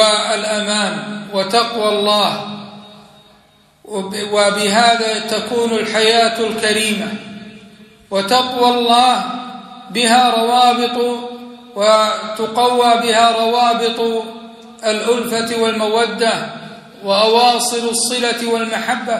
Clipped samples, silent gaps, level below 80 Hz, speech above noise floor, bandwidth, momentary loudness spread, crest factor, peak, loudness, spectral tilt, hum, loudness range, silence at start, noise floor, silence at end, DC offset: under 0.1%; none; -62 dBFS; 36 dB; 14.5 kHz; 16 LU; 16 dB; 0 dBFS; -15 LUFS; -2.5 dB/octave; none; 4 LU; 0 s; -51 dBFS; 0 s; under 0.1%